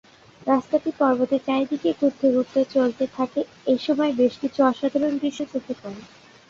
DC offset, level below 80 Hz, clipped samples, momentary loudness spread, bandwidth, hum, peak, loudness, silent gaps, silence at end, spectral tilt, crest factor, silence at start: under 0.1%; -64 dBFS; under 0.1%; 10 LU; 7.4 kHz; none; -6 dBFS; -23 LUFS; none; 0.45 s; -6 dB/octave; 18 dB; 0.45 s